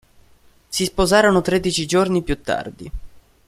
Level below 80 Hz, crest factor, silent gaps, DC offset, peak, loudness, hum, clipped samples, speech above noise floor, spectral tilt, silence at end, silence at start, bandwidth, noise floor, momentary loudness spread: -36 dBFS; 20 dB; none; under 0.1%; 0 dBFS; -19 LUFS; none; under 0.1%; 34 dB; -4.5 dB/octave; 0.3 s; 0.7 s; 15.5 kHz; -52 dBFS; 20 LU